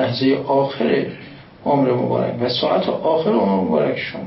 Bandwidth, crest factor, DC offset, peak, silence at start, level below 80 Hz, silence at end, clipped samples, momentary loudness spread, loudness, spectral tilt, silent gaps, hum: 5.8 kHz; 14 dB; under 0.1%; -6 dBFS; 0 s; -56 dBFS; 0 s; under 0.1%; 4 LU; -19 LUFS; -10.5 dB/octave; none; none